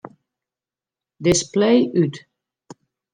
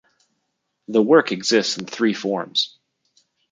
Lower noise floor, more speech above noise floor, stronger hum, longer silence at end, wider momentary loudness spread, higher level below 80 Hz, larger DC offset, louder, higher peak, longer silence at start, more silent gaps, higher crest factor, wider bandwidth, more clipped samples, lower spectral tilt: first, under -90 dBFS vs -75 dBFS; first, over 73 dB vs 55 dB; neither; about the same, 0.95 s vs 0.85 s; about the same, 8 LU vs 9 LU; first, -52 dBFS vs -72 dBFS; neither; about the same, -19 LUFS vs -20 LUFS; about the same, -4 dBFS vs -2 dBFS; first, 1.2 s vs 0.9 s; neither; about the same, 18 dB vs 20 dB; first, 13 kHz vs 9.4 kHz; neither; first, -5 dB/octave vs -3.5 dB/octave